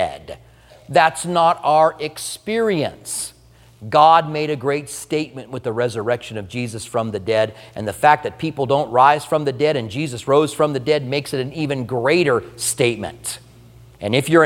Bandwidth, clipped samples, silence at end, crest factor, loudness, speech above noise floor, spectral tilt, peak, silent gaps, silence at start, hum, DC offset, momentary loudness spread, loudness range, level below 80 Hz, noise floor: 17 kHz; under 0.1%; 0 s; 18 dB; -19 LUFS; 26 dB; -4.5 dB/octave; 0 dBFS; none; 0 s; none; under 0.1%; 14 LU; 4 LU; -54 dBFS; -45 dBFS